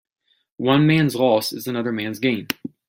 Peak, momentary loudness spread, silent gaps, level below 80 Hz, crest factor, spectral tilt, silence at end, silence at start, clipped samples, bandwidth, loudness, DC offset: 0 dBFS; 10 LU; none; -60 dBFS; 20 dB; -6 dB/octave; 0.2 s; 0.6 s; under 0.1%; 16.5 kHz; -20 LUFS; under 0.1%